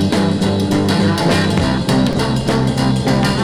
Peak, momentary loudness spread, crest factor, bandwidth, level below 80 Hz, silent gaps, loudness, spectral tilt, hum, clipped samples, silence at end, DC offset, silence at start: -2 dBFS; 2 LU; 12 dB; 15.5 kHz; -34 dBFS; none; -15 LUFS; -6 dB/octave; none; under 0.1%; 0 s; under 0.1%; 0 s